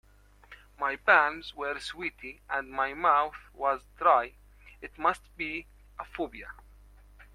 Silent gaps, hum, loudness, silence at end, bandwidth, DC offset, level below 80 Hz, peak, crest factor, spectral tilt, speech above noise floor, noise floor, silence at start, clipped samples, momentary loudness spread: none; 50 Hz at -55 dBFS; -29 LUFS; 0.1 s; 14.5 kHz; under 0.1%; -56 dBFS; -6 dBFS; 26 dB; -4 dB/octave; 27 dB; -56 dBFS; 0.5 s; under 0.1%; 22 LU